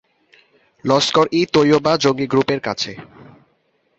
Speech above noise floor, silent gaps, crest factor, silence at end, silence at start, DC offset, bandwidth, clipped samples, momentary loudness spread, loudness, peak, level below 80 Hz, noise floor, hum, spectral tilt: 47 dB; none; 18 dB; 0.95 s; 0.85 s; under 0.1%; 8.2 kHz; under 0.1%; 11 LU; -17 LUFS; -2 dBFS; -56 dBFS; -63 dBFS; none; -5 dB/octave